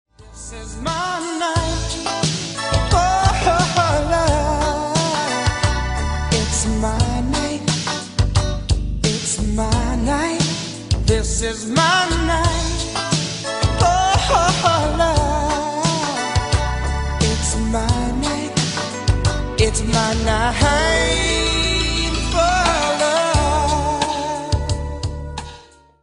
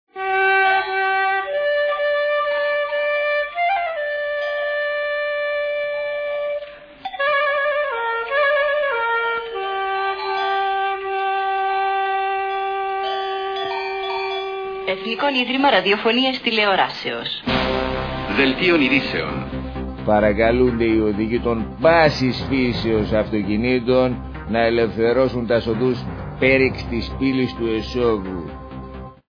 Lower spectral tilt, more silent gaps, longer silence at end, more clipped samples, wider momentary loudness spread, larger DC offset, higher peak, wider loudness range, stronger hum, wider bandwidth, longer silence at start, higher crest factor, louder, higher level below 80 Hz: second, -4 dB/octave vs -6.5 dB/octave; neither; first, 0.4 s vs 0.15 s; neither; about the same, 7 LU vs 9 LU; neither; about the same, 0 dBFS vs -2 dBFS; about the same, 3 LU vs 4 LU; neither; first, 11 kHz vs 5.4 kHz; about the same, 0.2 s vs 0.15 s; about the same, 18 dB vs 18 dB; about the same, -19 LUFS vs -20 LUFS; first, -26 dBFS vs -40 dBFS